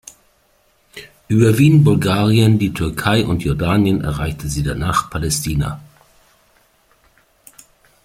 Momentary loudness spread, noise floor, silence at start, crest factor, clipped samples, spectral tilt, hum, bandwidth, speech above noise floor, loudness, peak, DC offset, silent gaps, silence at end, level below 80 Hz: 12 LU; -58 dBFS; 0.95 s; 16 dB; under 0.1%; -6 dB/octave; none; 16 kHz; 43 dB; -16 LUFS; -2 dBFS; under 0.1%; none; 2.2 s; -36 dBFS